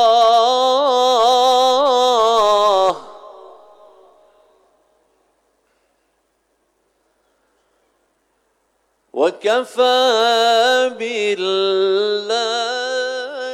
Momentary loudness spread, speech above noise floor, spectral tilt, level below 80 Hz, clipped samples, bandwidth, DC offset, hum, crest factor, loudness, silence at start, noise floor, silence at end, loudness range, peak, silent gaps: 8 LU; 50 dB; -1.5 dB/octave; -64 dBFS; under 0.1%; 16 kHz; under 0.1%; none; 12 dB; -15 LUFS; 0 s; -66 dBFS; 0 s; 11 LU; -6 dBFS; none